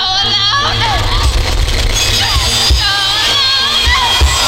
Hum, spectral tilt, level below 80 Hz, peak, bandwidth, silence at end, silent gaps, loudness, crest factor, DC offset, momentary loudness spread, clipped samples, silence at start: none; -2 dB/octave; -18 dBFS; -2 dBFS; 17 kHz; 0 s; none; -10 LUFS; 10 dB; under 0.1%; 5 LU; under 0.1%; 0 s